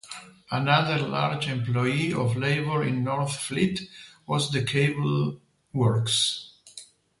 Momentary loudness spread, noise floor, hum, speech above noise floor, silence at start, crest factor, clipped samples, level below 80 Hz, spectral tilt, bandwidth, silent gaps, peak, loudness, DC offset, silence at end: 19 LU; -49 dBFS; none; 24 dB; 0.05 s; 20 dB; under 0.1%; -60 dBFS; -5 dB/octave; 11.5 kHz; none; -6 dBFS; -26 LUFS; under 0.1%; 0.35 s